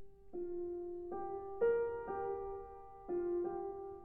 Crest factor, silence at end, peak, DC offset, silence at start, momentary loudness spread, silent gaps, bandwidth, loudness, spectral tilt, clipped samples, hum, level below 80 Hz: 16 dB; 0 s; -24 dBFS; under 0.1%; 0 s; 13 LU; none; 3 kHz; -41 LUFS; -8 dB/octave; under 0.1%; none; -64 dBFS